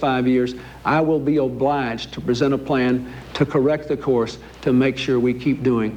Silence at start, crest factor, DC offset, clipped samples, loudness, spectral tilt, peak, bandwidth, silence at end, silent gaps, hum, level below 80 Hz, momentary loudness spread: 0 s; 14 dB; under 0.1%; under 0.1%; -20 LUFS; -7 dB/octave; -6 dBFS; 9 kHz; 0 s; none; none; -46 dBFS; 8 LU